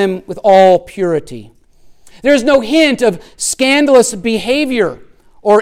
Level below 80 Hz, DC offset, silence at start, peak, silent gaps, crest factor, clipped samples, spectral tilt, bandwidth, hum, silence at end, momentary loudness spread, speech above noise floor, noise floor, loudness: -44 dBFS; under 0.1%; 0 s; 0 dBFS; none; 12 dB; under 0.1%; -3.5 dB/octave; 16 kHz; none; 0 s; 11 LU; 30 dB; -42 dBFS; -12 LUFS